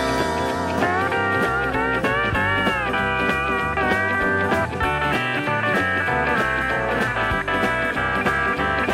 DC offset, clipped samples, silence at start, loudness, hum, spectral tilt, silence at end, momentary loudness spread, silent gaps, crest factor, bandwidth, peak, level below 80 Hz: under 0.1%; under 0.1%; 0 s; -20 LUFS; none; -5 dB/octave; 0 s; 2 LU; none; 14 dB; 16 kHz; -8 dBFS; -38 dBFS